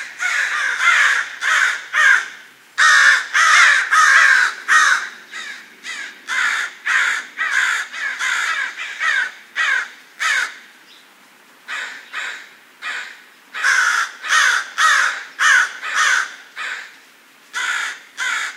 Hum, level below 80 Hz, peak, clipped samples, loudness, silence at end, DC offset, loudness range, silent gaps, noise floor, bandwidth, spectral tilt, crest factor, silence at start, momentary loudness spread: none; under -90 dBFS; 0 dBFS; under 0.1%; -15 LUFS; 0 s; under 0.1%; 11 LU; none; -48 dBFS; 16 kHz; 4 dB/octave; 18 dB; 0 s; 18 LU